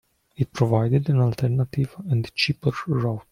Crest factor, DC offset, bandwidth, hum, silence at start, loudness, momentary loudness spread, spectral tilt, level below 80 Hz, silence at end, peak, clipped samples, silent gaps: 18 dB; under 0.1%; 12 kHz; none; 0.4 s; -23 LUFS; 6 LU; -7 dB/octave; -52 dBFS; 0.1 s; -6 dBFS; under 0.1%; none